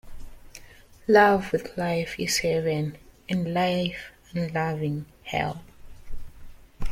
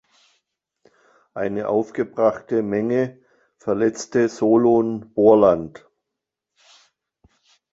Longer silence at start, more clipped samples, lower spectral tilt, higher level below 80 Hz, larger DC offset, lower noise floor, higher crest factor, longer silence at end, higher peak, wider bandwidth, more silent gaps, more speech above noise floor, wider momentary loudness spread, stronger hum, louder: second, 0.05 s vs 1.35 s; neither; second, -5 dB/octave vs -7 dB/octave; first, -42 dBFS vs -58 dBFS; neither; second, -49 dBFS vs -83 dBFS; about the same, 20 dB vs 20 dB; second, 0 s vs 2.05 s; second, -6 dBFS vs -2 dBFS; first, 16.5 kHz vs 8 kHz; neither; second, 25 dB vs 64 dB; first, 17 LU vs 12 LU; neither; second, -25 LUFS vs -20 LUFS